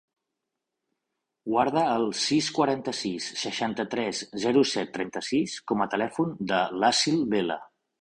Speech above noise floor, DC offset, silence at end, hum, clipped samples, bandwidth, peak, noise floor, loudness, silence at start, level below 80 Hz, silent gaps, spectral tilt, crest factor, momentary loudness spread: 58 dB; under 0.1%; 0.35 s; none; under 0.1%; 11 kHz; -10 dBFS; -84 dBFS; -26 LUFS; 1.45 s; -66 dBFS; none; -4 dB/octave; 18 dB; 8 LU